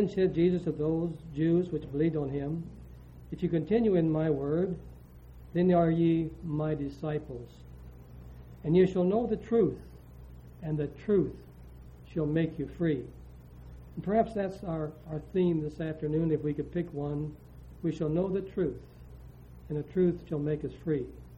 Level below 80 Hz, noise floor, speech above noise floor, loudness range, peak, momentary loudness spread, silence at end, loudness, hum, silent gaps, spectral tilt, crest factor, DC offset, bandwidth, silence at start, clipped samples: -52 dBFS; -50 dBFS; 20 dB; 4 LU; -12 dBFS; 24 LU; 0 s; -30 LUFS; none; none; -10 dB/octave; 18 dB; under 0.1%; 7.2 kHz; 0 s; under 0.1%